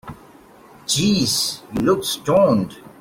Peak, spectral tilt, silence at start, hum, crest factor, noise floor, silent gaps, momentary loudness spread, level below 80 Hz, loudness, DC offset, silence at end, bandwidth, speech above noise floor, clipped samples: -4 dBFS; -4 dB/octave; 0.05 s; none; 16 dB; -46 dBFS; none; 13 LU; -50 dBFS; -18 LUFS; under 0.1%; 0.15 s; 16.5 kHz; 28 dB; under 0.1%